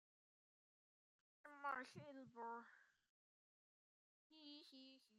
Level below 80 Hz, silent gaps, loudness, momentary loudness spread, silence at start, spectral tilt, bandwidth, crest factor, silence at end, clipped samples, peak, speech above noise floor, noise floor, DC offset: under -90 dBFS; 3.09-4.30 s; -55 LUFS; 16 LU; 1.45 s; -4.5 dB/octave; 11.5 kHz; 24 dB; 0 s; under 0.1%; -36 dBFS; over 31 dB; under -90 dBFS; under 0.1%